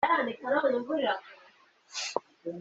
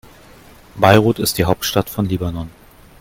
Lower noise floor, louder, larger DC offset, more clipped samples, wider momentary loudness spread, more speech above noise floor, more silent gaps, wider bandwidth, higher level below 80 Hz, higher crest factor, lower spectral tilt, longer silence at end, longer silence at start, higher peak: first, -60 dBFS vs -43 dBFS; second, -31 LUFS vs -16 LUFS; neither; neither; second, 10 LU vs 14 LU; about the same, 30 dB vs 28 dB; neither; second, 8.2 kHz vs 17 kHz; second, -74 dBFS vs -42 dBFS; about the same, 20 dB vs 18 dB; second, -3 dB/octave vs -5 dB/octave; second, 0 s vs 0.55 s; second, 0 s vs 0.75 s; second, -10 dBFS vs 0 dBFS